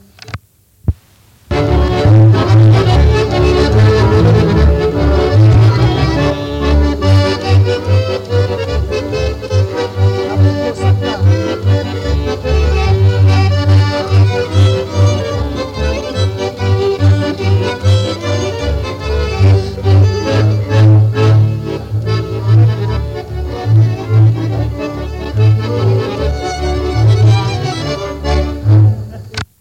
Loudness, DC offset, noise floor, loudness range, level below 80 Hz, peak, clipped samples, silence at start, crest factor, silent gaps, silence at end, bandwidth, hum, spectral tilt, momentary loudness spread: -12 LUFS; under 0.1%; -46 dBFS; 5 LU; -22 dBFS; -2 dBFS; under 0.1%; 0.3 s; 8 dB; none; 0.15 s; 8.4 kHz; none; -7 dB/octave; 10 LU